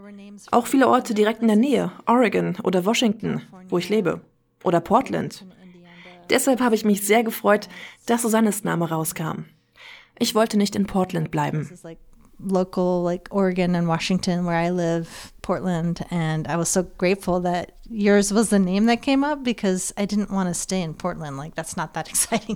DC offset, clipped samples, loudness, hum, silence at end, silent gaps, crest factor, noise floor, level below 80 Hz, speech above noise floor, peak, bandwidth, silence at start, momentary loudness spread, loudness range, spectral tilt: under 0.1%; under 0.1%; -22 LUFS; none; 0 s; none; 18 dB; -47 dBFS; -50 dBFS; 25 dB; -4 dBFS; 20 kHz; 0 s; 11 LU; 4 LU; -5 dB/octave